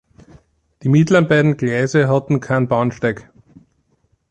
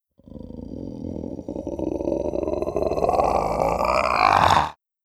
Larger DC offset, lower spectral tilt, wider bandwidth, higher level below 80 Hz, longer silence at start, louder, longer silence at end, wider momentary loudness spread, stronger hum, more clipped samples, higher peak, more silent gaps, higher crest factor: neither; first, -7 dB/octave vs -5.5 dB/octave; second, 9 kHz vs 14 kHz; second, -52 dBFS vs -40 dBFS; first, 0.85 s vs 0.3 s; first, -16 LUFS vs -22 LUFS; first, 1.1 s vs 0.3 s; second, 9 LU vs 18 LU; neither; neither; about the same, -2 dBFS vs -4 dBFS; neither; about the same, 16 dB vs 20 dB